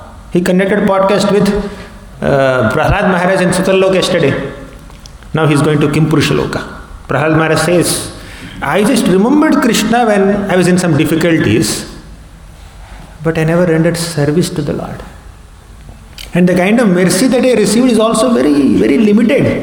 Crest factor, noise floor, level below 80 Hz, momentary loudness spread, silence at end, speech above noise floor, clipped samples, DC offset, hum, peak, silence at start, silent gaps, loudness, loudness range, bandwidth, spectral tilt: 12 dB; -35 dBFS; -34 dBFS; 11 LU; 0 s; 25 dB; under 0.1%; under 0.1%; none; 0 dBFS; 0 s; none; -11 LUFS; 5 LU; 19 kHz; -5.5 dB/octave